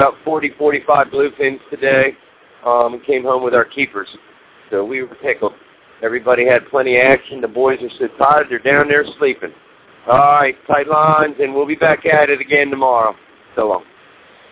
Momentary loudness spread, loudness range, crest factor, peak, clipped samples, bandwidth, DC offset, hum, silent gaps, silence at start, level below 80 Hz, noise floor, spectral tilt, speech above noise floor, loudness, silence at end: 11 LU; 5 LU; 16 dB; 0 dBFS; under 0.1%; 4 kHz; under 0.1%; none; none; 0 s; -52 dBFS; -45 dBFS; -8.5 dB/octave; 31 dB; -15 LUFS; 0.7 s